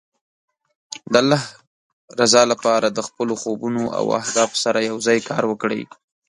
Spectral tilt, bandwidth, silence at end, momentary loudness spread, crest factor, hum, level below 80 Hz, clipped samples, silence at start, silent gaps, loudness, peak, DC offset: -3.5 dB/octave; 11.5 kHz; 0.45 s; 14 LU; 20 dB; none; -64 dBFS; under 0.1%; 0.9 s; 1.67-2.08 s; -19 LUFS; 0 dBFS; under 0.1%